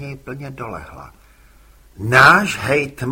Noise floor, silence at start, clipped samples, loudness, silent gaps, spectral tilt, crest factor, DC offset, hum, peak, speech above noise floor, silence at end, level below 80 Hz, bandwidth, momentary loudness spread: -48 dBFS; 0 s; under 0.1%; -13 LUFS; none; -4.5 dB/octave; 18 dB; under 0.1%; none; 0 dBFS; 31 dB; 0 s; -44 dBFS; 16.5 kHz; 22 LU